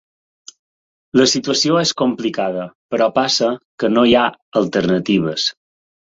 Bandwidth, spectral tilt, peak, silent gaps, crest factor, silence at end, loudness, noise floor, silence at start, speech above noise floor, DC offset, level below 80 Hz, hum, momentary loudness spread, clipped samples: 8 kHz; -4 dB/octave; -2 dBFS; 2.75-2.89 s, 3.65-3.78 s, 4.42-4.52 s; 16 dB; 0.6 s; -17 LUFS; under -90 dBFS; 1.15 s; over 74 dB; under 0.1%; -52 dBFS; none; 8 LU; under 0.1%